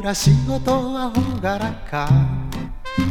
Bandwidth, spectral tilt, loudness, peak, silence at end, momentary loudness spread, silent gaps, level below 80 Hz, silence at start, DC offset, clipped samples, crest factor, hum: 17.5 kHz; -6 dB/octave; -20 LUFS; -4 dBFS; 0 s; 10 LU; none; -32 dBFS; 0 s; under 0.1%; under 0.1%; 16 dB; none